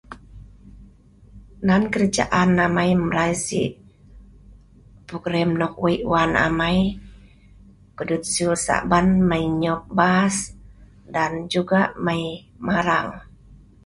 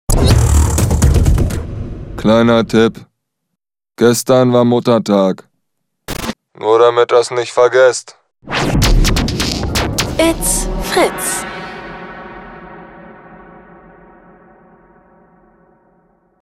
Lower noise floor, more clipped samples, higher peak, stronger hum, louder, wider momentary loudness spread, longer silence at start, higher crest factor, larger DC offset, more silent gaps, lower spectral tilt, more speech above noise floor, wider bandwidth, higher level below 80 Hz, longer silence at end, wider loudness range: second, -49 dBFS vs -77 dBFS; neither; about the same, -2 dBFS vs 0 dBFS; neither; second, -21 LUFS vs -13 LUFS; second, 12 LU vs 18 LU; about the same, 0.1 s vs 0.1 s; first, 20 dB vs 14 dB; neither; neither; about the same, -5 dB/octave vs -5 dB/octave; second, 29 dB vs 65 dB; second, 11.5 kHz vs 16 kHz; second, -44 dBFS vs -22 dBFS; second, 0.3 s vs 3.1 s; second, 3 LU vs 8 LU